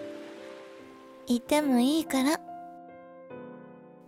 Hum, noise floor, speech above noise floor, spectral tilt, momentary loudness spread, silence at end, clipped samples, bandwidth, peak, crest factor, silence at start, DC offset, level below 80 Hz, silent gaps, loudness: none; -50 dBFS; 24 dB; -3.5 dB/octave; 24 LU; 0.25 s; under 0.1%; 16.5 kHz; -12 dBFS; 18 dB; 0 s; under 0.1%; -68 dBFS; none; -27 LUFS